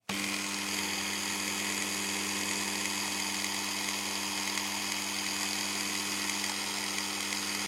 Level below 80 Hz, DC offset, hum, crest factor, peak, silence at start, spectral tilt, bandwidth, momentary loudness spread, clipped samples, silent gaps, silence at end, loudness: -72 dBFS; under 0.1%; none; 20 dB; -14 dBFS; 0.1 s; -1 dB/octave; 16 kHz; 1 LU; under 0.1%; none; 0 s; -31 LUFS